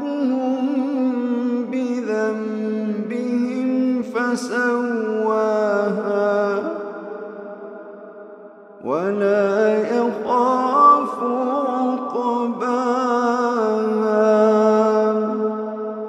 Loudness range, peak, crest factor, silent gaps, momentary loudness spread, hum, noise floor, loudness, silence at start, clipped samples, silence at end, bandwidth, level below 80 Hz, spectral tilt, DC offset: 5 LU; -4 dBFS; 16 dB; none; 15 LU; none; -41 dBFS; -20 LUFS; 0 s; under 0.1%; 0 s; 10.5 kHz; -76 dBFS; -6.5 dB/octave; under 0.1%